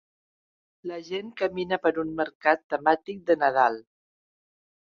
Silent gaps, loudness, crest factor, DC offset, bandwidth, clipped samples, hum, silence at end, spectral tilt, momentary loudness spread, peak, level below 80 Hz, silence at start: 2.35-2.40 s, 2.64-2.70 s; -26 LUFS; 22 dB; under 0.1%; 6.8 kHz; under 0.1%; none; 1.1 s; -6 dB/octave; 14 LU; -6 dBFS; -68 dBFS; 0.85 s